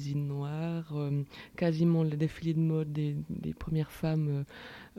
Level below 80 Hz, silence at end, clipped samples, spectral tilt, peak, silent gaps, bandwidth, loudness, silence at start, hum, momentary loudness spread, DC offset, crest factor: -56 dBFS; 0.1 s; under 0.1%; -8.5 dB/octave; -16 dBFS; none; 13 kHz; -32 LUFS; 0 s; none; 10 LU; under 0.1%; 16 dB